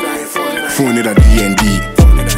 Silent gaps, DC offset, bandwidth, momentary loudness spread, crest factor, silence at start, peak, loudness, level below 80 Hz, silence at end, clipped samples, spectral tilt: none; under 0.1%; 16.5 kHz; 8 LU; 10 dB; 0 s; 0 dBFS; -12 LUFS; -12 dBFS; 0 s; under 0.1%; -5 dB/octave